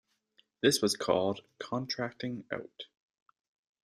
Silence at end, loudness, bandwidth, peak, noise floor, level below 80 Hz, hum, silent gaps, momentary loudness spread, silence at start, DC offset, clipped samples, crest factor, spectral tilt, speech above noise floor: 1 s; -32 LUFS; 15 kHz; -12 dBFS; -71 dBFS; -72 dBFS; none; none; 17 LU; 0.65 s; under 0.1%; under 0.1%; 22 dB; -3.5 dB/octave; 38 dB